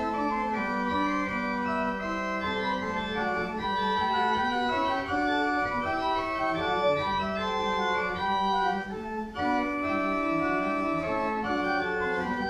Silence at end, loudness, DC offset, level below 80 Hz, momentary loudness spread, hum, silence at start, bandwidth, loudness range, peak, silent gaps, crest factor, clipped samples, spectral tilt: 0 s; -28 LUFS; under 0.1%; -52 dBFS; 4 LU; none; 0 s; 12.5 kHz; 2 LU; -16 dBFS; none; 12 dB; under 0.1%; -5.5 dB/octave